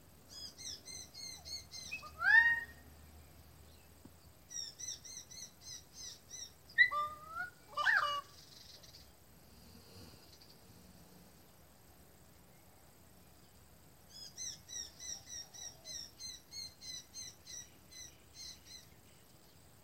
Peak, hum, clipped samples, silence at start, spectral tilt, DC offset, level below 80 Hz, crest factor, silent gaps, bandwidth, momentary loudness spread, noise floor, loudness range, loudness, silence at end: -16 dBFS; none; under 0.1%; 0.05 s; 0 dB/octave; under 0.1%; -68 dBFS; 26 dB; none; 16 kHz; 28 LU; -63 dBFS; 23 LU; -37 LUFS; 0.25 s